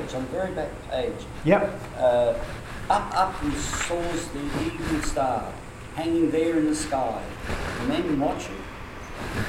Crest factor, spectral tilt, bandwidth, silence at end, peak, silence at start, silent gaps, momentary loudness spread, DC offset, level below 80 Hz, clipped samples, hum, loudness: 20 dB; -5 dB/octave; 16 kHz; 0 s; -6 dBFS; 0 s; none; 13 LU; under 0.1%; -40 dBFS; under 0.1%; none; -26 LUFS